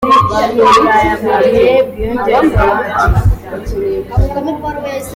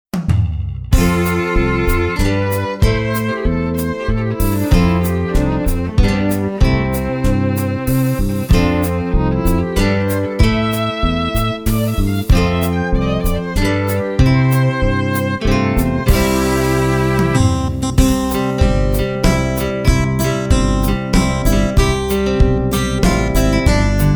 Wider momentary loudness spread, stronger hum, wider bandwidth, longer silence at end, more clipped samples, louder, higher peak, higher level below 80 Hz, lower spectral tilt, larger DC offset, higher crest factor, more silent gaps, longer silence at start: first, 11 LU vs 4 LU; neither; second, 16.5 kHz vs over 20 kHz; about the same, 0 s vs 0 s; neither; first, -12 LUFS vs -16 LUFS; about the same, 0 dBFS vs 0 dBFS; about the same, -22 dBFS vs -20 dBFS; about the same, -6.5 dB/octave vs -6 dB/octave; neither; about the same, 12 dB vs 14 dB; neither; second, 0 s vs 0.15 s